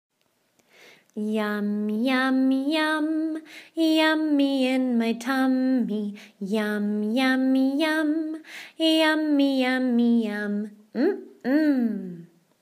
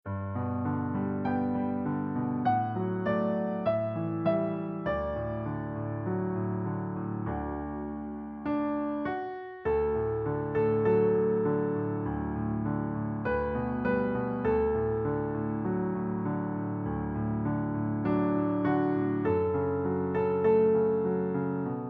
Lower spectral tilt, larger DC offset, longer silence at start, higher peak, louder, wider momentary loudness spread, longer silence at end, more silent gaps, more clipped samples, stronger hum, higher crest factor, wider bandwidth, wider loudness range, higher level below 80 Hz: second, -5 dB/octave vs -8.5 dB/octave; neither; first, 1.15 s vs 0.05 s; first, -8 dBFS vs -14 dBFS; first, -24 LUFS vs -30 LUFS; first, 12 LU vs 7 LU; first, 0.35 s vs 0 s; neither; neither; neither; about the same, 16 dB vs 14 dB; first, 15.5 kHz vs 4.9 kHz; second, 2 LU vs 6 LU; second, -84 dBFS vs -50 dBFS